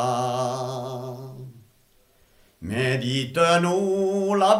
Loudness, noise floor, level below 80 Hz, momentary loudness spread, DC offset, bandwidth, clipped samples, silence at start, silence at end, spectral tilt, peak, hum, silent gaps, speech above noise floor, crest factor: -24 LUFS; -60 dBFS; -60 dBFS; 20 LU; under 0.1%; 15.5 kHz; under 0.1%; 0 s; 0 s; -5 dB/octave; -4 dBFS; none; none; 40 dB; 20 dB